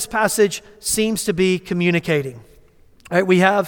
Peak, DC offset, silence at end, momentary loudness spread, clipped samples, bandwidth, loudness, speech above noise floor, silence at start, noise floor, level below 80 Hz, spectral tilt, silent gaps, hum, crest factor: -2 dBFS; under 0.1%; 0 s; 6 LU; under 0.1%; 18.5 kHz; -19 LUFS; 31 dB; 0 s; -50 dBFS; -50 dBFS; -4.5 dB/octave; none; none; 18 dB